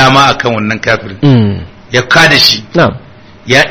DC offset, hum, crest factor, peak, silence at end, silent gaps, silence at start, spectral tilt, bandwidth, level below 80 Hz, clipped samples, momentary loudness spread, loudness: 0.7%; none; 8 dB; 0 dBFS; 0 s; none; 0 s; -4.5 dB/octave; over 20 kHz; -38 dBFS; 2%; 9 LU; -8 LUFS